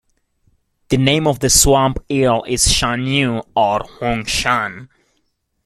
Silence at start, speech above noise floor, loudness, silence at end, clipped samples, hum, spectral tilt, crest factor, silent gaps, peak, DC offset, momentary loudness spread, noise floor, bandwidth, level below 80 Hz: 0.9 s; 51 dB; -15 LUFS; 0.8 s; under 0.1%; none; -3.5 dB/octave; 18 dB; none; 0 dBFS; under 0.1%; 9 LU; -67 dBFS; 15 kHz; -32 dBFS